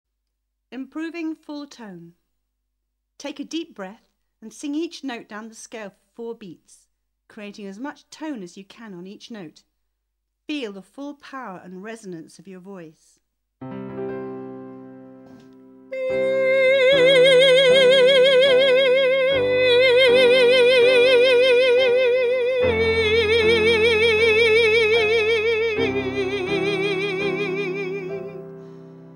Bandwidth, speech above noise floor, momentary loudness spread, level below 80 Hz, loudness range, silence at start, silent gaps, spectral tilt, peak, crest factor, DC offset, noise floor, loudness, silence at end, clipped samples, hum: 11 kHz; 43 dB; 24 LU; -54 dBFS; 22 LU; 0.7 s; none; -4 dB/octave; -4 dBFS; 16 dB; under 0.1%; -77 dBFS; -17 LUFS; 0.1 s; under 0.1%; none